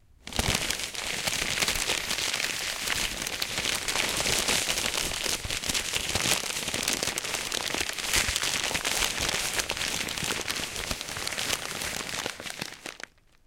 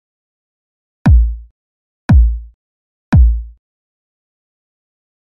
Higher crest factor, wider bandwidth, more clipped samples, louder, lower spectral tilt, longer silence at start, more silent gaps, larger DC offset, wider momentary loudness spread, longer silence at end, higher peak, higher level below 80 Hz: first, 22 dB vs 14 dB; first, 17 kHz vs 5.8 kHz; neither; second, -27 LUFS vs -14 LUFS; second, -1 dB/octave vs -9.5 dB/octave; second, 0.25 s vs 1.05 s; second, none vs 1.51-2.09 s, 2.54-3.12 s; neither; second, 7 LU vs 16 LU; second, 0.5 s vs 1.75 s; second, -8 dBFS vs -2 dBFS; second, -46 dBFS vs -16 dBFS